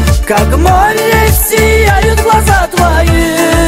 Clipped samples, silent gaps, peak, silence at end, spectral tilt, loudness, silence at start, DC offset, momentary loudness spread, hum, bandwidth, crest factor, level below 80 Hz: 0.1%; none; 0 dBFS; 0 s; -4.5 dB/octave; -8 LUFS; 0 s; under 0.1%; 2 LU; none; 16.5 kHz; 8 dB; -14 dBFS